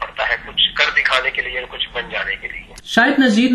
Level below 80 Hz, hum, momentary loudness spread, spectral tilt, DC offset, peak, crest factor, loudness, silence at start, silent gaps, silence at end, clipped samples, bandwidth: -44 dBFS; none; 10 LU; -3.5 dB/octave; under 0.1%; 0 dBFS; 18 dB; -17 LUFS; 0 s; none; 0 s; under 0.1%; 13.5 kHz